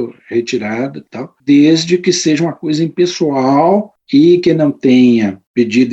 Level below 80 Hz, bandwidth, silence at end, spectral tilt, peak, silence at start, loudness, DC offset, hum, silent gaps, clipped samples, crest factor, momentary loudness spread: -58 dBFS; 8.4 kHz; 0 s; -5.5 dB/octave; 0 dBFS; 0 s; -12 LUFS; under 0.1%; none; 5.47-5.54 s; under 0.1%; 12 dB; 10 LU